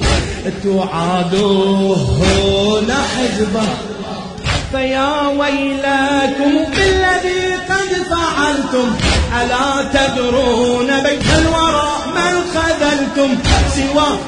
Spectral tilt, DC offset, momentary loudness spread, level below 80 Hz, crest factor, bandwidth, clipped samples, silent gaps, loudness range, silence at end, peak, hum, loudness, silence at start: -4.5 dB/octave; under 0.1%; 5 LU; -28 dBFS; 14 dB; 10.5 kHz; under 0.1%; none; 2 LU; 0 s; 0 dBFS; none; -14 LUFS; 0 s